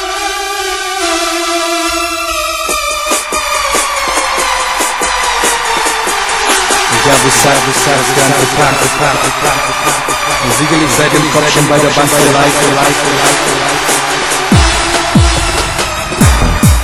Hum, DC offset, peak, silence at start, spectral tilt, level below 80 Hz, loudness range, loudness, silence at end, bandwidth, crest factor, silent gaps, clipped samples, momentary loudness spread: none; 1%; 0 dBFS; 0 s; -3 dB/octave; -22 dBFS; 4 LU; -10 LUFS; 0 s; over 20 kHz; 10 dB; none; 0.5%; 5 LU